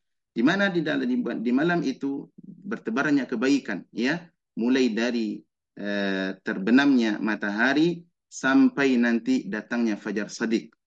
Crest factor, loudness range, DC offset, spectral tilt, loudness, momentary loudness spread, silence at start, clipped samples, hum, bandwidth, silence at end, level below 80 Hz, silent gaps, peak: 16 dB; 4 LU; under 0.1%; -5.5 dB/octave; -25 LUFS; 13 LU; 0.35 s; under 0.1%; none; 8 kHz; 0.2 s; -74 dBFS; none; -8 dBFS